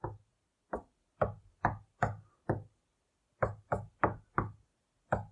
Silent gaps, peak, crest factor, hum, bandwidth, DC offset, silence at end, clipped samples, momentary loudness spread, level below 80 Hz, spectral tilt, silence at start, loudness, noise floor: none; -10 dBFS; 28 dB; none; 9.8 kHz; under 0.1%; 0 s; under 0.1%; 10 LU; -54 dBFS; -8.5 dB/octave; 0.05 s; -38 LUFS; -79 dBFS